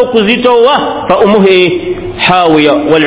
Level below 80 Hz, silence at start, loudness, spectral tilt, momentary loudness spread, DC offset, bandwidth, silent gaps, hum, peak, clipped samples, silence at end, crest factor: -38 dBFS; 0 s; -8 LUFS; -9.5 dB/octave; 6 LU; under 0.1%; 4 kHz; none; none; 0 dBFS; 3%; 0 s; 8 dB